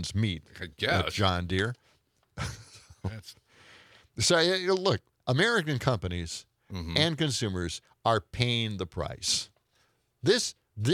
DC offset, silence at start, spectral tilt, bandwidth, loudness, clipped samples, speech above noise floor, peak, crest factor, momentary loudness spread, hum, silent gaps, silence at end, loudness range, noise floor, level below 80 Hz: under 0.1%; 0 s; -4 dB/octave; 15.5 kHz; -29 LUFS; under 0.1%; 42 dB; -6 dBFS; 24 dB; 15 LU; none; none; 0 s; 4 LU; -70 dBFS; -56 dBFS